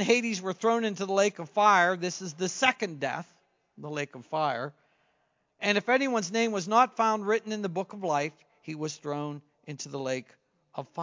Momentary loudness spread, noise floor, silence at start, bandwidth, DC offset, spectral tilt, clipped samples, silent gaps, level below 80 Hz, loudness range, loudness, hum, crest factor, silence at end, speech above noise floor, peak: 15 LU; -74 dBFS; 0 s; 7.6 kHz; under 0.1%; -4 dB/octave; under 0.1%; none; -82 dBFS; 6 LU; -28 LUFS; none; 24 dB; 0 s; 45 dB; -6 dBFS